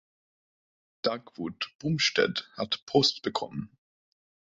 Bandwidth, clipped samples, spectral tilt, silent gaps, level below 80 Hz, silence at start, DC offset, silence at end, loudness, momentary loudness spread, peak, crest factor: 7.8 kHz; under 0.1%; -4 dB/octave; 1.75-1.79 s, 2.82-2.87 s; -66 dBFS; 1.05 s; under 0.1%; 0.85 s; -29 LUFS; 14 LU; -10 dBFS; 22 dB